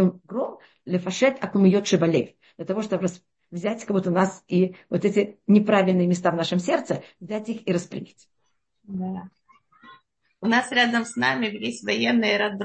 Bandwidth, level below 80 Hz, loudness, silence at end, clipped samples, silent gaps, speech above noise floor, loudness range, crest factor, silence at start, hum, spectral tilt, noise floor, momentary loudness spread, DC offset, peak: 8.8 kHz; -68 dBFS; -23 LUFS; 0 s; under 0.1%; none; 52 dB; 8 LU; 18 dB; 0 s; none; -5.5 dB/octave; -75 dBFS; 13 LU; under 0.1%; -6 dBFS